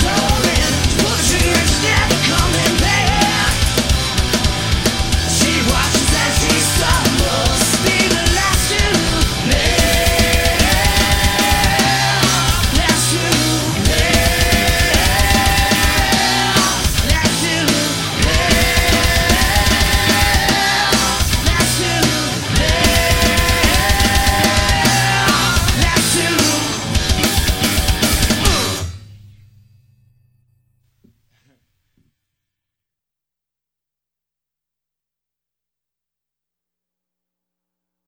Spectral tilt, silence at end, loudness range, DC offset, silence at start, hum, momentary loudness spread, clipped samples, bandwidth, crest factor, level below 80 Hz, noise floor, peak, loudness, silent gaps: -3 dB/octave; 8.9 s; 2 LU; under 0.1%; 0 s; 60 Hz at -40 dBFS; 3 LU; under 0.1%; 17 kHz; 16 dB; -22 dBFS; -85 dBFS; 0 dBFS; -14 LUFS; none